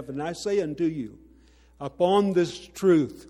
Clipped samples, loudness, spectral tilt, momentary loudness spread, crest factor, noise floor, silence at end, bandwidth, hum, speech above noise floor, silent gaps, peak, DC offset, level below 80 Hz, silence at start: under 0.1%; -25 LUFS; -6.5 dB/octave; 16 LU; 16 dB; -55 dBFS; 0.05 s; 13.5 kHz; none; 31 dB; none; -8 dBFS; under 0.1%; -58 dBFS; 0 s